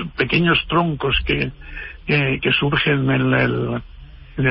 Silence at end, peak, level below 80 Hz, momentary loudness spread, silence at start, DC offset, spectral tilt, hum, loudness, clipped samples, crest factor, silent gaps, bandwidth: 0 s; -6 dBFS; -36 dBFS; 13 LU; 0 s; under 0.1%; -11 dB/octave; none; -18 LUFS; under 0.1%; 14 dB; none; 5.8 kHz